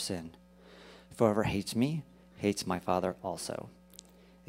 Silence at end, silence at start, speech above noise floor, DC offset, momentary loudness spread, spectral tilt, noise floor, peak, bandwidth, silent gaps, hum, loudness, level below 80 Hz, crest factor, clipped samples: 0.75 s; 0 s; 24 dB; under 0.1%; 24 LU; -5.5 dB/octave; -56 dBFS; -12 dBFS; 16 kHz; none; none; -33 LUFS; -60 dBFS; 24 dB; under 0.1%